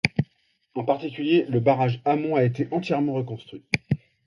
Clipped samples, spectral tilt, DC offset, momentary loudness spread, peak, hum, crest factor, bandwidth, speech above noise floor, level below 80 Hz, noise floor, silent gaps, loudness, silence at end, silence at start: under 0.1%; -7.5 dB/octave; under 0.1%; 10 LU; -2 dBFS; none; 22 dB; 11 kHz; 44 dB; -56 dBFS; -67 dBFS; none; -24 LUFS; 0.3 s; 0.05 s